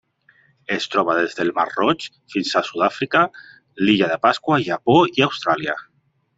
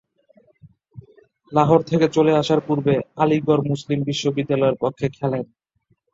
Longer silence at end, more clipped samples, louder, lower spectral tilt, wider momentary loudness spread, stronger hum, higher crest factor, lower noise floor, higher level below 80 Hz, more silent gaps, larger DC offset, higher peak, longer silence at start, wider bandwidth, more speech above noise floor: second, 0.55 s vs 0.7 s; neither; about the same, -19 LUFS vs -20 LUFS; second, -5.5 dB/octave vs -7 dB/octave; about the same, 10 LU vs 8 LU; neither; about the same, 18 dB vs 20 dB; second, -57 dBFS vs -66 dBFS; about the same, -60 dBFS vs -58 dBFS; neither; neither; about the same, -2 dBFS vs -2 dBFS; about the same, 0.7 s vs 0.65 s; about the same, 8 kHz vs 7.8 kHz; second, 38 dB vs 47 dB